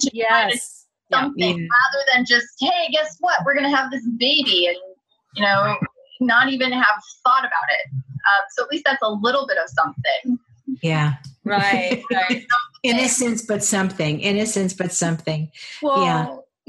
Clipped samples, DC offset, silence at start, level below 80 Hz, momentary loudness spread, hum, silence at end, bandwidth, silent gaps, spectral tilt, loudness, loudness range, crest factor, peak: under 0.1%; under 0.1%; 0 s; -64 dBFS; 9 LU; none; 0.3 s; 12.5 kHz; none; -3.5 dB/octave; -19 LUFS; 3 LU; 16 dB; -4 dBFS